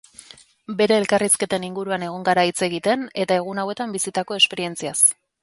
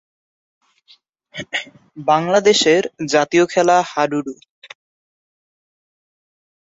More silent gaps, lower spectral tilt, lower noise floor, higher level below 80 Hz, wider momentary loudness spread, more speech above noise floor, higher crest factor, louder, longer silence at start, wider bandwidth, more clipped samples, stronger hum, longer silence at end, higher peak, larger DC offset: neither; about the same, -2.5 dB/octave vs -3.5 dB/octave; second, -46 dBFS vs -54 dBFS; about the same, -66 dBFS vs -64 dBFS; second, 10 LU vs 17 LU; second, 25 dB vs 38 dB; about the same, 18 dB vs 18 dB; second, -20 LUFS vs -16 LUFS; second, 0.7 s vs 1.35 s; first, 12 kHz vs 8 kHz; neither; neither; second, 0.3 s vs 2.3 s; about the same, -4 dBFS vs -2 dBFS; neither